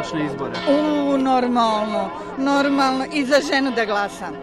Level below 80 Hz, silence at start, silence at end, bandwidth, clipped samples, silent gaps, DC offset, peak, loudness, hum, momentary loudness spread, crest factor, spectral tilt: -52 dBFS; 0 s; 0 s; 12.5 kHz; under 0.1%; none; under 0.1%; -6 dBFS; -20 LUFS; none; 7 LU; 14 dB; -4.5 dB/octave